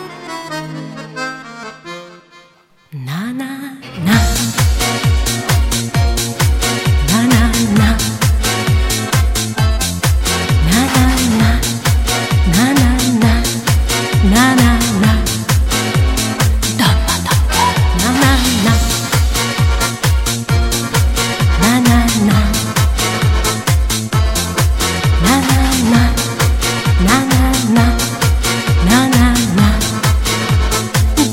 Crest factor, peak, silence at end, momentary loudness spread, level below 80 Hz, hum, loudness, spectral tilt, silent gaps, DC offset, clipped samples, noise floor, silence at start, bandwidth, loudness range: 12 dB; 0 dBFS; 0 s; 10 LU; -18 dBFS; none; -13 LUFS; -4.5 dB/octave; none; under 0.1%; under 0.1%; -49 dBFS; 0 s; 17 kHz; 3 LU